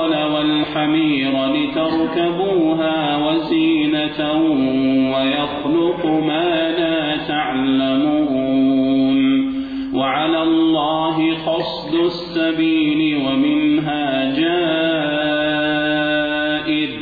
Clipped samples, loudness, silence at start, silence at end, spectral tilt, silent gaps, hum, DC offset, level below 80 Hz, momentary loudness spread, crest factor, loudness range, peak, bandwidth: under 0.1%; -17 LUFS; 0 s; 0 s; -8 dB/octave; none; none; under 0.1%; -50 dBFS; 4 LU; 10 dB; 1 LU; -8 dBFS; 4.9 kHz